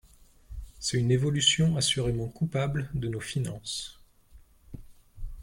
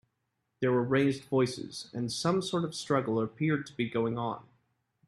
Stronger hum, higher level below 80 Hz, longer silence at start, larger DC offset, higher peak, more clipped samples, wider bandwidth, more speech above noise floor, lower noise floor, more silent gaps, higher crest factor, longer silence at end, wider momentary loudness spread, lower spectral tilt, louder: neither; first, -46 dBFS vs -68 dBFS; second, 0.2 s vs 0.6 s; neither; about the same, -10 dBFS vs -12 dBFS; neither; first, 16.5 kHz vs 12.5 kHz; second, 28 dB vs 51 dB; second, -55 dBFS vs -81 dBFS; neither; about the same, 20 dB vs 18 dB; second, 0 s vs 0.65 s; first, 24 LU vs 9 LU; second, -4 dB/octave vs -6 dB/octave; first, -28 LUFS vs -31 LUFS